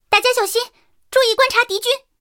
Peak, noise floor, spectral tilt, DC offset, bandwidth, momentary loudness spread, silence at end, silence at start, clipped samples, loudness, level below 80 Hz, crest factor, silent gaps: 0 dBFS; -42 dBFS; 0.5 dB/octave; under 0.1%; 17 kHz; 7 LU; 0.25 s; 0.1 s; under 0.1%; -16 LUFS; -58 dBFS; 18 dB; none